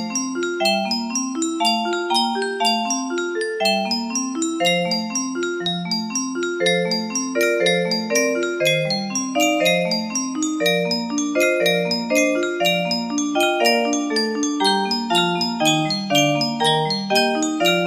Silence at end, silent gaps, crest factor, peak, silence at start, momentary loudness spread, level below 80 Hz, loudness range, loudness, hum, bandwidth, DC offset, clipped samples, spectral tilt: 0 s; none; 16 dB; -4 dBFS; 0 s; 6 LU; -68 dBFS; 3 LU; -19 LUFS; none; 15.5 kHz; under 0.1%; under 0.1%; -3 dB/octave